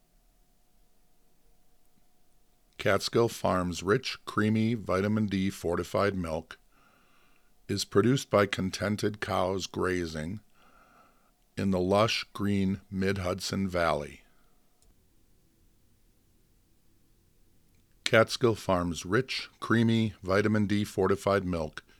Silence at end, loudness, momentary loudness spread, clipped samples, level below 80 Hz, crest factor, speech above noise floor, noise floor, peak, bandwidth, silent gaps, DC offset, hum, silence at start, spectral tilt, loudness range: 0.2 s; -29 LUFS; 9 LU; under 0.1%; -58 dBFS; 26 dB; 37 dB; -65 dBFS; -4 dBFS; 17 kHz; none; under 0.1%; none; 2.8 s; -5.5 dB/octave; 6 LU